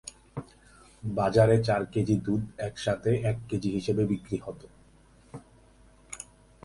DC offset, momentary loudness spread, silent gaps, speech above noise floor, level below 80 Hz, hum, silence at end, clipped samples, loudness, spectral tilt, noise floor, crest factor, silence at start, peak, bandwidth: under 0.1%; 23 LU; none; 31 dB; -52 dBFS; none; 0.4 s; under 0.1%; -28 LUFS; -7 dB/octave; -58 dBFS; 22 dB; 0.05 s; -8 dBFS; 11.5 kHz